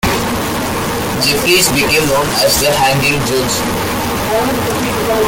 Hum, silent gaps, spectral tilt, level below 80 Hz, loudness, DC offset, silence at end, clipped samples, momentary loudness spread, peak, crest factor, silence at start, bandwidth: none; none; -3 dB/octave; -32 dBFS; -13 LUFS; under 0.1%; 0 s; under 0.1%; 7 LU; 0 dBFS; 14 dB; 0.05 s; 17 kHz